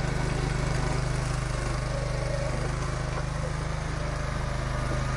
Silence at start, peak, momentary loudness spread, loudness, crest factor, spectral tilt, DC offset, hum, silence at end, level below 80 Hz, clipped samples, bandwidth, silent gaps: 0 s; -16 dBFS; 3 LU; -30 LUFS; 14 dB; -5.5 dB/octave; under 0.1%; none; 0 s; -34 dBFS; under 0.1%; 11.5 kHz; none